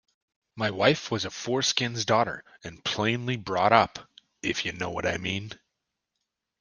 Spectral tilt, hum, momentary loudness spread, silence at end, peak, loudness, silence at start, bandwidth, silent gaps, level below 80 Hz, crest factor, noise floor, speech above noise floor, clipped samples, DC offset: -4 dB/octave; none; 12 LU; 1.05 s; -2 dBFS; -27 LUFS; 0.55 s; 10.5 kHz; none; -62 dBFS; 26 dB; -83 dBFS; 56 dB; under 0.1%; under 0.1%